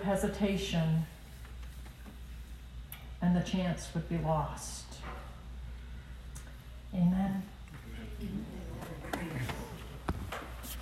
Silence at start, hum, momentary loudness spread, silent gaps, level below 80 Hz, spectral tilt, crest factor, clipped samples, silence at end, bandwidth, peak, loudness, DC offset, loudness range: 0 s; none; 17 LU; none; -46 dBFS; -6 dB/octave; 18 dB; under 0.1%; 0 s; 15.5 kHz; -18 dBFS; -36 LUFS; under 0.1%; 4 LU